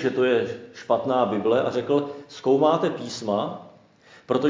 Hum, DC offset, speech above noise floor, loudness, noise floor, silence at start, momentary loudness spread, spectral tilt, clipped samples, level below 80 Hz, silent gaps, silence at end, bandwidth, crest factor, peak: none; under 0.1%; 30 dB; -24 LUFS; -53 dBFS; 0 s; 12 LU; -6 dB/octave; under 0.1%; -66 dBFS; none; 0 s; 7.6 kHz; 16 dB; -6 dBFS